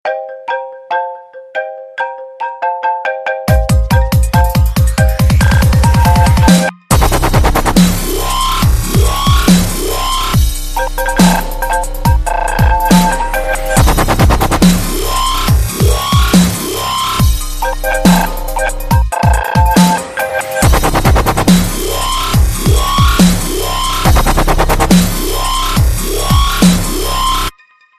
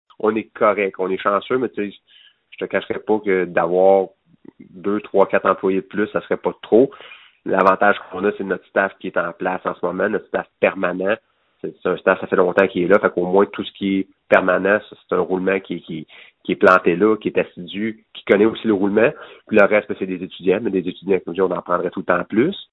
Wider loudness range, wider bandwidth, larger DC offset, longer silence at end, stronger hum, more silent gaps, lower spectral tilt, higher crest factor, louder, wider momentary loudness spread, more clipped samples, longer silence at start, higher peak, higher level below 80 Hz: about the same, 3 LU vs 4 LU; first, 14.5 kHz vs 6.4 kHz; neither; first, 0.5 s vs 0.1 s; neither; neither; second, -5 dB/octave vs -8 dB/octave; second, 10 dB vs 20 dB; first, -12 LUFS vs -19 LUFS; about the same, 9 LU vs 11 LU; neither; second, 0.05 s vs 0.25 s; about the same, 0 dBFS vs 0 dBFS; first, -16 dBFS vs -60 dBFS